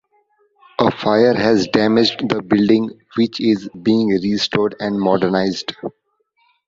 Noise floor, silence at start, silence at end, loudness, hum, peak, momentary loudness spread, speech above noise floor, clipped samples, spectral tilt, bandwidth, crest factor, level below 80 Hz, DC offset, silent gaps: -65 dBFS; 0.8 s; 0.75 s; -17 LUFS; none; 0 dBFS; 9 LU; 49 dB; under 0.1%; -6 dB/octave; 7.6 kHz; 18 dB; -54 dBFS; under 0.1%; none